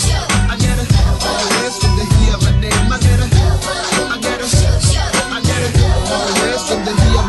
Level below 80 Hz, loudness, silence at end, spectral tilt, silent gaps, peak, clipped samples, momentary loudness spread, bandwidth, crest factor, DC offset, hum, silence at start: -18 dBFS; -14 LUFS; 0 s; -4.5 dB/octave; none; 0 dBFS; under 0.1%; 3 LU; 12.5 kHz; 12 dB; under 0.1%; none; 0 s